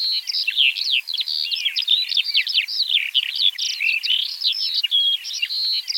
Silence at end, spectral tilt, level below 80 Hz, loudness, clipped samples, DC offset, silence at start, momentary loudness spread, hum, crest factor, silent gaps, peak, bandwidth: 0 s; 8.5 dB/octave; -88 dBFS; -18 LUFS; under 0.1%; under 0.1%; 0 s; 4 LU; none; 16 dB; none; -6 dBFS; 17 kHz